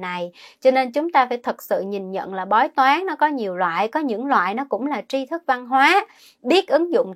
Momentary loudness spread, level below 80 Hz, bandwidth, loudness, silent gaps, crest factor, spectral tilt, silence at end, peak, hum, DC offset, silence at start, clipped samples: 11 LU; -78 dBFS; 16 kHz; -20 LUFS; none; 18 dB; -4.5 dB/octave; 0 s; -2 dBFS; none; under 0.1%; 0 s; under 0.1%